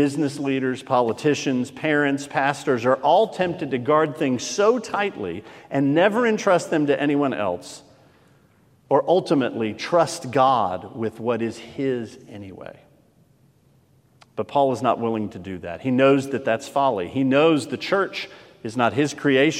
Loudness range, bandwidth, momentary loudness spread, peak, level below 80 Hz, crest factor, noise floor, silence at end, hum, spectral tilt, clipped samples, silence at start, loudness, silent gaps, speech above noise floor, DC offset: 6 LU; 14 kHz; 14 LU; -4 dBFS; -68 dBFS; 18 dB; -58 dBFS; 0 s; none; -5.5 dB/octave; under 0.1%; 0 s; -22 LUFS; none; 37 dB; under 0.1%